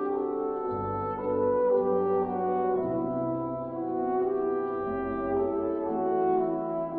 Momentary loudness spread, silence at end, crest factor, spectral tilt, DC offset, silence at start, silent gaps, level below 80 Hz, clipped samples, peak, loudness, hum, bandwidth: 6 LU; 0 s; 12 dB; -12 dB/octave; under 0.1%; 0 s; none; -58 dBFS; under 0.1%; -16 dBFS; -29 LUFS; none; 3.3 kHz